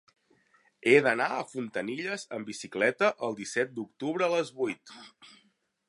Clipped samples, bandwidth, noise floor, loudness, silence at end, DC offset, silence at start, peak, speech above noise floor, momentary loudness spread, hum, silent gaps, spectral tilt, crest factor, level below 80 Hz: under 0.1%; 11.5 kHz; -70 dBFS; -29 LUFS; 0.6 s; under 0.1%; 0.85 s; -8 dBFS; 40 dB; 15 LU; none; none; -4.5 dB/octave; 24 dB; -82 dBFS